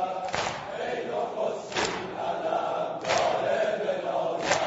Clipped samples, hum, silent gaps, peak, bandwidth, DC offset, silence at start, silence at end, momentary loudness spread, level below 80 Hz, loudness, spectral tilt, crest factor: under 0.1%; none; none; -8 dBFS; 8 kHz; under 0.1%; 0 s; 0 s; 6 LU; -62 dBFS; -29 LUFS; -3 dB/octave; 22 dB